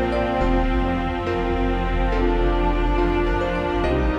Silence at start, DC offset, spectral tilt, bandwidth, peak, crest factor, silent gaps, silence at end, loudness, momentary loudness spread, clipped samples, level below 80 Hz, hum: 0 s; under 0.1%; -7.5 dB/octave; 7.2 kHz; -8 dBFS; 12 dB; none; 0 s; -22 LUFS; 2 LU; under 0.1%; -24 dBFS; none